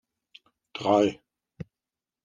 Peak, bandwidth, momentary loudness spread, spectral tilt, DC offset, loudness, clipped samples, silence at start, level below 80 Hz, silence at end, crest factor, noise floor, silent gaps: -8 dBFS; 9.2 kHz; 22 LU; -6 dB/octave; under 0.1%; -25 LUFS; under 0.1%; 0.75 s; -68 dBFS; 1.1 s; 22 dB; under -90 dBFS; none